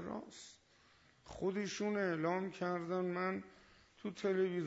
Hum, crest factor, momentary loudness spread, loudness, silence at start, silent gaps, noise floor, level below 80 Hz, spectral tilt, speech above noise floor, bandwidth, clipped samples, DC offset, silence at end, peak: none; 16 dB; 18 LU; -39 LUFS; 0 s; none; -69 dBFS; -74 dBFS; -5 dB/octave; 30 dB; 7.6 kHz; under 0.1%; under 0.1%; 0 s; -24 dBFS